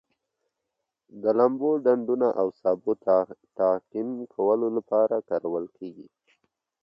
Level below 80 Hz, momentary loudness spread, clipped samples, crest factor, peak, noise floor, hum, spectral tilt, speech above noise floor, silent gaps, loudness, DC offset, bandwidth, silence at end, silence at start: -74 dBFS; 10 LU; under 0.1%; 18 dB; -8 dBFS; -83 dBFS; none; -10 dB/octave; 58 dB; none; -25 LUFS; under 0.1%; 5.6 kHz; 0.8 s; 1.15 s